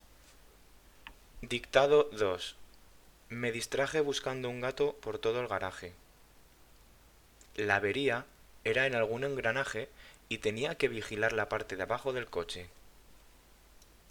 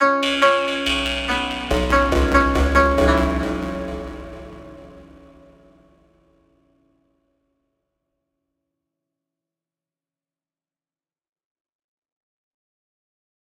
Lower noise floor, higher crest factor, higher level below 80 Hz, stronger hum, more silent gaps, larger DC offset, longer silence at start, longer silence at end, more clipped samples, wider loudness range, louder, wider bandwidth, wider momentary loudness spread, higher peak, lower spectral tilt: second, -60 dBFS vs under -90 dBFS; first, 26 dB vs 20 dB; second, -60 dBFS vs -32 dBFS; neither; neither; neither; first, 0.95 s vs 0 s; second, 0.9 s vs 8.4 s; neither; second, 4 LU vs 18 LU; second, -33 LUFS vs -19 LUFS; first, 19.5 kHz vs 16 kHz; second, 17 LU vs 20 LU; second, -8 dBFS vs -2 dBFS; about the same, -4 dB/octave vs -5 dB/octave